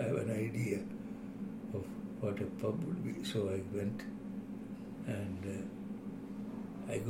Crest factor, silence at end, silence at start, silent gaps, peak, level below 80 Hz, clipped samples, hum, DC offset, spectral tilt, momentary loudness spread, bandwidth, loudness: 18 dB; 0 s; 0 s; none; -22 dBFS; -64 dBFS; under 0.1%; none; under 0.1%; -7 dB/octave; 8 LU; 16.5 kHz; -40 LUFS